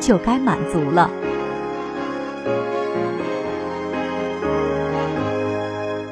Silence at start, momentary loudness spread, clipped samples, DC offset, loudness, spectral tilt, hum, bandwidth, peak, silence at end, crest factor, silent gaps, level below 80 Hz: 0 s; 9 LU; under 0.1%; under 0.1%; -22 LUFS; -6 dB/octave; none; 11 kHz; -2 dBFS; 0 s; 20 dB; none; -46 dBFS